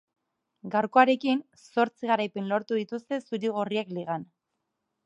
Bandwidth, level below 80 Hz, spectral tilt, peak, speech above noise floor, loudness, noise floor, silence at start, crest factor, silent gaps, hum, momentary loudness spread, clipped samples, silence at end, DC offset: 9.2 kHz; -82 dBFS; -6.5 dB/octave; -6 dBFS; 55 dB; -28 LUFS; -82 dBFS; 0.65 s; 22 dB; none; none; 12 LU; under 0.1%; 0.8 s; under 0.1%